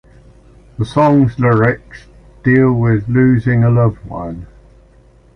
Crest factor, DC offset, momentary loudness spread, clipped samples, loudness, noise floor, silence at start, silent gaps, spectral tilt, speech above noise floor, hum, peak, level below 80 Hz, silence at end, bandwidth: 12 dB; under 0.1%; 14 LU; under 0.1%; -13 LUFS; -46 dBFS; 0.8 s; none; -9.5 dB/octave; 34 dB; none; -2 dBFS; -38 dBFS; 0.9 s; 9.4 kHz